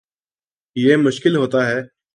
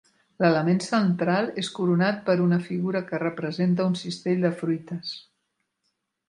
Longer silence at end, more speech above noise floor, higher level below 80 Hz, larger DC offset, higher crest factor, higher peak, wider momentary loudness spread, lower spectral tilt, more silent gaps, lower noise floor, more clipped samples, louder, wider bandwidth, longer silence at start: second, 0.3 s vs 1.1 s; first, over 74 dB vs 53 dB; about the same, -66 dBFS vs -70 dBFS; neither; about the same, 18 dB vs 20 dB; first, -2 dBFS vs -6 dBFS; about the same, 9 LU vs 7 LU; about the same, -6 dB/octave vs -6.5 dB/octave; neither; first, under -90 dBFS vs -77 dBFS; neither; first, -17 LUFS vs -25 LUFS; about the same, 11 kHz vs 10.5 kHz; first, 0.75 s vs 0.4 s